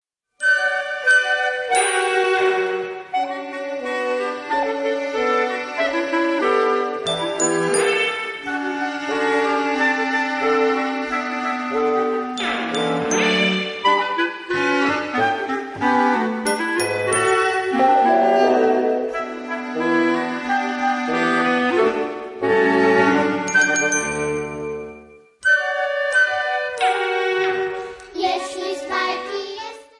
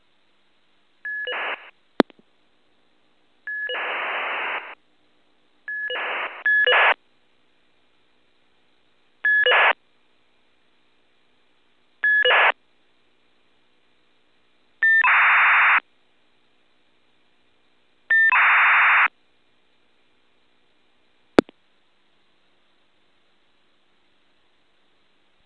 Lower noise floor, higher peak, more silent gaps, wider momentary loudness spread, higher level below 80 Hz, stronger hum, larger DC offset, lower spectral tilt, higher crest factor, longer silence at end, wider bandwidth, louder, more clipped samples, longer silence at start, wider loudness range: second, -45 dBFS vs -66 dBFS; second, -4 dBFS vs 0 dBFS; neither; second, 10 LU vs 17 LU; first, -60 dBFS vs -66 dBFS; neither; neither; about the same, -3 dB/octave vs -4 dB/octave; second, 16 dB vs 24 dB; second, 0.15 s vs 4.05 s; about the same, 11.5 kHz vs 10.5 kHz; about the same, -20 LUFS vs -18 LUFS; neither; second, 0.4 s vs 1.05 s; second, 3 LU vs 11 LU